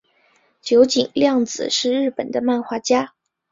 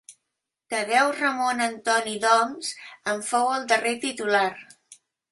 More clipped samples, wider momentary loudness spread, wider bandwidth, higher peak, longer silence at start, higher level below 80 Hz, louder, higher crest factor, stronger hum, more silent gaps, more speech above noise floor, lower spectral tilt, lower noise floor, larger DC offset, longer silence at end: neither; second, 7 LU vs 10 LU; second, 7.8 kHz vs 12 kHz; first, -2 dBFS vs -6 dBFS; first, 0.65 s vs 0.1 s; first, -62 dBFS vs -74 dBFS; first, -19 LUFS vs -24 LUFS; about the same, 18 dB vs 18 dB; neither; neither; second, 42 dB vs 59 dB; first, -3 dB/octave vs -1.5 dB/octave; second, -60 dBFS vs -83 dBFS; neither; about the same, 0.45 s vs 0.35 s